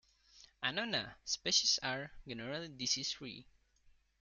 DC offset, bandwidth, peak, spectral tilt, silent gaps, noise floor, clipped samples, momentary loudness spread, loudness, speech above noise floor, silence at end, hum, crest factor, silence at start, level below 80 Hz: under 0.1%; 11.5 kHz; -18 dBFS; -1 dB/octave; none; -69 dBFS; under 0.1%; 16 LU; -36 LUFS; 30 dB; 0.8 s; none; 22 dB; 0.35 s; -68 dBFS